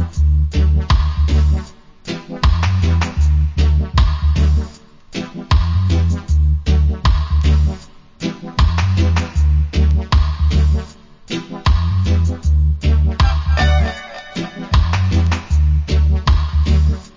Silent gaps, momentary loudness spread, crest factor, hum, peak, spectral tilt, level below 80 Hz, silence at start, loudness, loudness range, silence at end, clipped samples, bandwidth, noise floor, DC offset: none; 11 LU; 14 dB; none; 0 dBFS; -6.5 dB/octave; -16 dBFS; 0 s; -16 LUFS; 0 LU; 0.1 s; under 0.1%; 7.6 kHz; -37 dBFS; under 0.1%